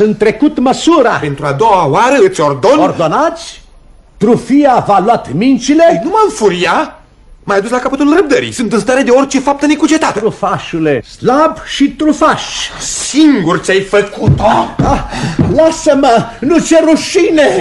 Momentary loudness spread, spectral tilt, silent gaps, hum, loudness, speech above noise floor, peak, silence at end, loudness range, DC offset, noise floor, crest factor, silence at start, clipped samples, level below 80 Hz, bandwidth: 6 LU; -5 dB/octave; none; none; -10 LUFS; 30 dB; 0 dBFS; 0 s; 2 LU; under 0.1%; -39 dBFS; 10 dB; 0 s; under 0.1%; -34 dBFS; 11.5 kHz